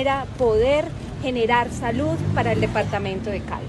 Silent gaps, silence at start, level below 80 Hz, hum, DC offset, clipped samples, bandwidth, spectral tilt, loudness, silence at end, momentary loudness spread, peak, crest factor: none; 0 s; -38 dBFS; none; under 0.1%; under 0.1%; 12 kHz; -6.5 dB/octave; -22 LUFS; 0 s; 8 LU; -6 dBFS; 16 dB